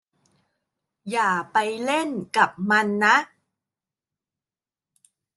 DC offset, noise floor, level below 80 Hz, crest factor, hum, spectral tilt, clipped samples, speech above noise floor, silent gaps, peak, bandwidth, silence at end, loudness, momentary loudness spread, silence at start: under 0.1%; under -90 dBFS; -74 dBFS; 22 dB; none; -4 dB/octave; under 0.1%; over 68 dB; none; -4 dBFS; 12.5 kHz; 2.1 s; -22 LUFS; 9 LU; 1.05 s